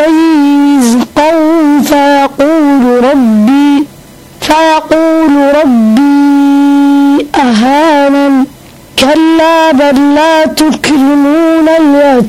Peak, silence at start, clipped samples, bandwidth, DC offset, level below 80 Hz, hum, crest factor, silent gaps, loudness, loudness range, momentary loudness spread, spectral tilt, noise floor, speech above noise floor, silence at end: 0 dBFS; 0 s; under 0.1%; 15.5 kHz; 1%; -40 dBFS; none; 6 dB; none; -6 LUFS; 1 LU; 3 LU; -4.5 dB/octave; -32 dBFS; 27 dB; 0 s